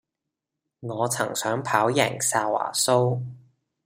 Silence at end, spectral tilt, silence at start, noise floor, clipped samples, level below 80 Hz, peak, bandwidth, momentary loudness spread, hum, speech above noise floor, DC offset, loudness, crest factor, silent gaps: 0.45 s; -3.5 dB/octave; 0.8 s; -85 dBFS; under 0.1%; -68 dBFS; -2 dBFS; 16 kHz; 12 LU; none; 61 dB; under 0.1%; -24 LUFS; 22 dB; none